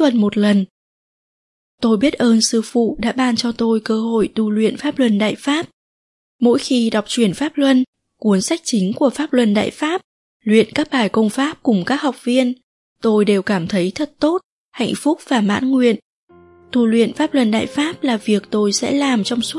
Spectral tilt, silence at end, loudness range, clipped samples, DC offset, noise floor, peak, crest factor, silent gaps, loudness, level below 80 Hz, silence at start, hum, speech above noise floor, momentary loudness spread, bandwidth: -5 dB/octave; 0 s; 2 LU; under 0.1%; under 0.1%; under -90 dBFS; -2 dBFS; 16 dB; 0.70-1.78 s, 5.73-6.39 s, 7.87-7.93 s, 10.04-10.40 s, 12.63-12.96 s, 14.44-14.72 s, 16.02-16.28 s; -17 LUFS; -54 dBFS; 0 s; none; over 74 dB; 7 LU; 11.5 kHz